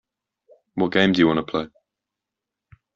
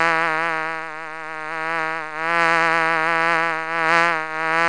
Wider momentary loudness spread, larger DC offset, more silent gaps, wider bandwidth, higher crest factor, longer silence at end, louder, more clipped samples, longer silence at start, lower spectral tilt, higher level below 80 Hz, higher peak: first, 16 LU vs 12 LU; second, under 0.1% vs 0.6%; neither; second, 7.4 kHz vs 10.5 kHz; about the same, 20 dB vs 20 dB; first, 1.3 s vs 0 s; about the same, -20 LUFS vs -20 LUFS; neither; first, 0.75 s vs 0 s; about the same, -4 dB/octave vs -3.5 dB/octave; first, -58 dBFS vs -76 dBFS; second, -4 dBFS vs 0 dBFS